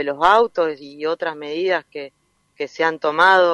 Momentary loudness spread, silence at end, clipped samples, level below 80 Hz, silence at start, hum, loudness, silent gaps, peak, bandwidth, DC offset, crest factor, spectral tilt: 17 LU; 0 s; under 0.1%; -60 dBFS; 0 s; none; -19 LUFS; none; -2 dBFS; 11 kHz; under 0.1%; 16 dB; -4 dB/octave